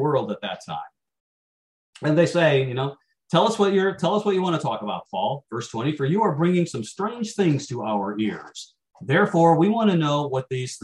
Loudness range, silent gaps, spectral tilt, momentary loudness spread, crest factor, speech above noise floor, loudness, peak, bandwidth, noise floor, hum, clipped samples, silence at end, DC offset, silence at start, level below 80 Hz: 3 LU; 1.20-1.93 s; -6 dB/octave; 12 LU; 18 dB; over 68 dB; -23 LUFS; -4 dBFS; 11.5 kHz; under -90 dBFS; none; under 0.1%; 0.05 s; under 0.1%; 0 s; -66 dBFS